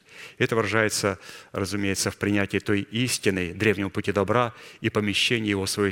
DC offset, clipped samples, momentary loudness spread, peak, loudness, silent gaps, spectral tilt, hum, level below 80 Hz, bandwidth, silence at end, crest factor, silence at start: under 0.1%; under 0.1%; 7 LU; -4 dBFS; -25 LUFS; none; -4 dB/octave; none; -58 dBFS; 17 kHz; 0 s; 20 dB; 0.1 s